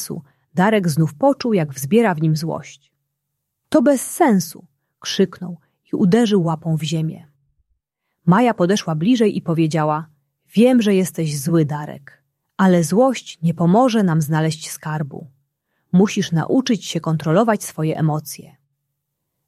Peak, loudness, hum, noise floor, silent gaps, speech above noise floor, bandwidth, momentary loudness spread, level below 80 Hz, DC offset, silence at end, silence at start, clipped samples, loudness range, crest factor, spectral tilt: -2 dBFS; -18 LUFS; none; -77 dBFS; none; 59 dB; 14.5 kHz; 12 LU; -62 dBFS; under 0.1%; 1 s; 0 s; under 0.1%; 3 LU; 16 dB; -6 dB/octave